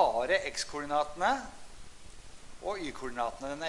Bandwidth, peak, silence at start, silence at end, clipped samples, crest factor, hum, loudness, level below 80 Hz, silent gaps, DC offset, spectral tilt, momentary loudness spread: 11.5 kHz; -12 dBFS; 0 s; 0 s; under 0.1%; 22 dB; none; -33 LUFS; -54 dBFS; none; under 0.1%; -2.5 dB/octave; 24 LU